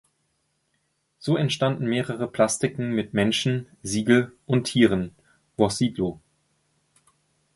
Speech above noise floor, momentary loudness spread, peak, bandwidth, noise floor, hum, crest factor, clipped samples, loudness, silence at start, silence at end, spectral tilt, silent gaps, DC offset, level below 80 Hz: 49 dB; 9 LU; -4 dBFS; 11.5 kHz; -72 dBFS; none; 22 dB; under 0.1%; -24 LUFS; 1.2 s; 1.4 s; -5 dB/octave; none; under 0.1%; -56 dBFS